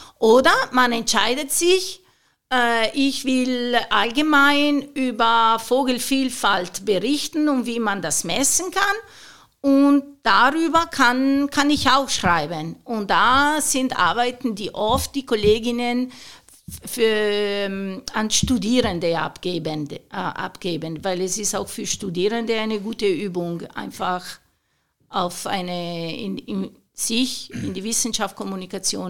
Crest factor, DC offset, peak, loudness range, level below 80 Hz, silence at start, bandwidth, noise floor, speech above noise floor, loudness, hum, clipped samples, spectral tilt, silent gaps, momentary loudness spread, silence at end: 18 dB; 0.9%; -2 dBFS; 7 LU; -48 dBFS; 0 s; 18 kHz; -69 dBFS; 48 dB; -20 LUFS; none; under 0.1%; -3 dB/octave; none; 12 LU; 0 s